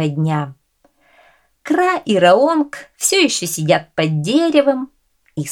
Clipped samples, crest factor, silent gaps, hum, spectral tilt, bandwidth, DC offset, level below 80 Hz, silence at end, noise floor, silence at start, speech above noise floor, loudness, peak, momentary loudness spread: under 0.1%; 16 dB; none; none; -4.5 dB/octave; 18 kHz; under 0.1%; -62 dBFS; 0 s; -58 dBFS; 0 s; 43 dB; -16 LUFS; 0 dBFS; 15 LU